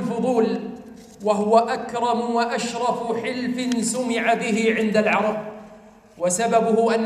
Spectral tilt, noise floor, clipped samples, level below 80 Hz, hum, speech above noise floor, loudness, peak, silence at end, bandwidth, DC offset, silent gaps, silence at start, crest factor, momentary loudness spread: -4.5 dB/octave; -47 dBFS; under 0.1%; -62 dBFS; none; 26 dB; -22 LUFS; -4 dBFS; 0 s; 15 kHz; under 0.1%; none; 0 s; 18 dB; 10 LU